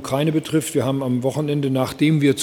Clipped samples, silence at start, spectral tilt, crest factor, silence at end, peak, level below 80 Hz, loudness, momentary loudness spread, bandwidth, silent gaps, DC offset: under 0.1%; 0 s; -6 dB/octave; 14 dB; 0 s; -4 dBFS; -56 dBFS; -20 LUFS; 5 LU; 17.5 kHz; none; under 0.1%